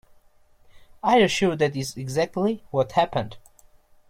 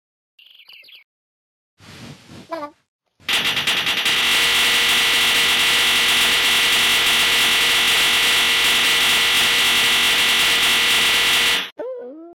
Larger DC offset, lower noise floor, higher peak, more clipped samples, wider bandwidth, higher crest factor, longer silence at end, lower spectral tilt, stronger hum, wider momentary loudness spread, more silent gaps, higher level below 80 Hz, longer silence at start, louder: neither; first, -56 dBFS vs -45 dBFS; first, -6 dBFS vs -12 dBFS; neither; about the same, 16.5 kHz vs 17 kHz; first, 18 dB vs 8 dB; first, 0.7 s vs 0 s; first, -5 dB/octave vs 0.5 dB/octave; neither; first, 11 LU vs 7 LU; second, none vs 2.88-2.99 s, 11.72-11.76 s; second, -56 dBFS vs -50 dBFS; second, 0.75 s vs 1.9 s; second, -23 LUFS vs -14 LUFS